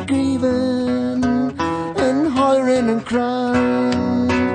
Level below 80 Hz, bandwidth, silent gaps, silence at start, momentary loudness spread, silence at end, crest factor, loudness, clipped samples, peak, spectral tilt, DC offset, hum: -46 dBFS; 9.4 kHz; none; 0 s; 4 LU; 0 s; 12 dB; -18 LUFS; under 0.1%; -6 dBFS; -6 dB/octave; under 0.1%; none